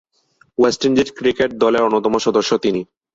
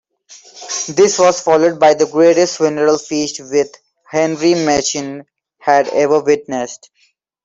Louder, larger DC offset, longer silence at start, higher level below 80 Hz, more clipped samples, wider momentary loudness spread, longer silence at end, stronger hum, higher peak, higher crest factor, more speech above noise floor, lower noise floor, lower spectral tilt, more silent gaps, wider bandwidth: second, -17 LUFS vs -14 LUFS; neither; first, 0.6 s vs 0.3 s; about the same, -52 dBFS vs -56 dBFS; neither; second, 5 LU vs 12 LU; second, 0.3 s vs 0.7 s; neither; about the same, -2 dBFS vs 0 dBFS; about the same, 14 dB vs 14 dB; second, 41 dB vs 46 dB; about the same, -58 dBFS vs -59 dBFS; about the same, -4.5 dB/octave vs -3.5 dB/octave; neither; about the same, 8 kHz vs 8 kHz